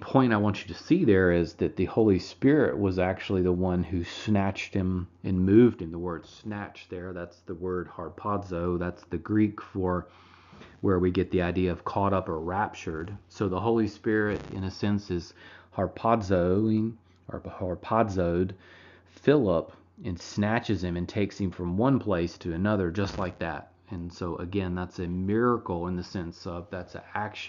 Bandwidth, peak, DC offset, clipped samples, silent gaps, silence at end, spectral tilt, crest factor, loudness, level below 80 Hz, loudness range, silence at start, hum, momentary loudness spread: 7.4 kHz; -8 dBFS; under 0.1%; under 0.1%; none; 0 s; -6.5 dB/octave; 20 dB; -28 LUFS; -52 dBFS; 5 LU; 0 s; none; 14 LU